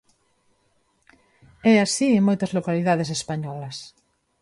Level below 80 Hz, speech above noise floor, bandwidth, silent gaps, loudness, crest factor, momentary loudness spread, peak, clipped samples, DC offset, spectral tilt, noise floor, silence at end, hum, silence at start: -62 dBFS; 46 dB; 11.5 kHz; none; -22 LUFS; 18 dB; 15 LU; -6 dBFS; under 0.1%; under 0.1%; -5 dB/octave; -67 dBFS; 0.55 s; none; 1.65 s